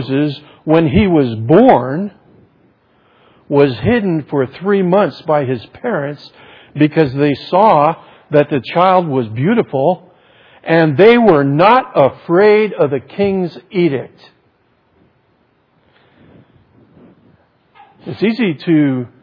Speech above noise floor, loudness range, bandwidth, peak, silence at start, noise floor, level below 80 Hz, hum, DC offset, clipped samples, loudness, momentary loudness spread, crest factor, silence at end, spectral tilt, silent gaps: 44 dB; 10 LU; 5.4 kHz; 0 dBFS; 0 s; -57 dBFS; -44 dBFS; none; under 0.1%; under 0.1%; -13 LUFS; 12 LU; 14 dB; 0.15 s; -9.5 dB/octave; none